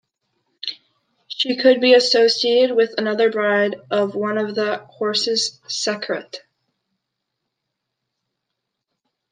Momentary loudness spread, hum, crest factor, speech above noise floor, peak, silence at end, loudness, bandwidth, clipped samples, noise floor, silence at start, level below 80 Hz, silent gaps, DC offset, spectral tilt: 16 LU; none; 18 dB; 61 dB; -2 dBFS; 2.95 s; -18 LUFS; 9.8 kHz; under 0.1%; -79 dBFS; 0.65 s; -76 dBFS; none; under 0.1%; -3 dB/octave